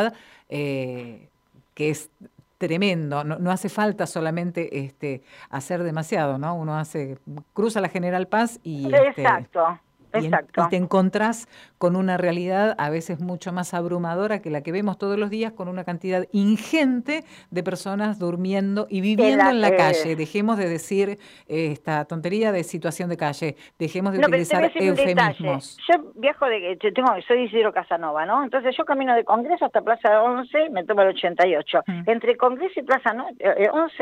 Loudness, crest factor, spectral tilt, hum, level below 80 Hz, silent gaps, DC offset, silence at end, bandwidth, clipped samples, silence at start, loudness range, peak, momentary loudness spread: -22 LUFS; 16 dB; -6 dB/octave; none; -68 dBFS; none; under 0.1%; 0 s; 15.5 kHz; under 0.1%; 0 s; 6 LU; -6 dBFS; 11 LU